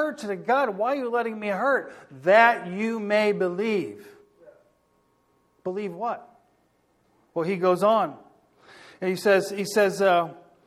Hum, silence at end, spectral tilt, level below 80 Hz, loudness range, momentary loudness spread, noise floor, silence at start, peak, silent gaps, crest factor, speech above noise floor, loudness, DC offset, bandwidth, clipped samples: none; 0.25 s; -5 dB/octave; -74 dBFS; 12 LU; 12 LU; -66 dBFS; 0 s; -4 dBFS; none; 22 dB; 43 dB; -24 LUFS; under 0.1%; 15 kHz; under 0.1%